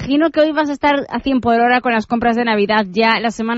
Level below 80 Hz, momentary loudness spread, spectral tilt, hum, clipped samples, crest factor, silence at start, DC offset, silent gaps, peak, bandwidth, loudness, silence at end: -44 dBFS; 4 LU; -5.5 dB/octave; none; under 0.1%; 14 dB; 0 s; under 0.1%; none; -2 dBFS; 8 kHz; -15 LUFS; 0 s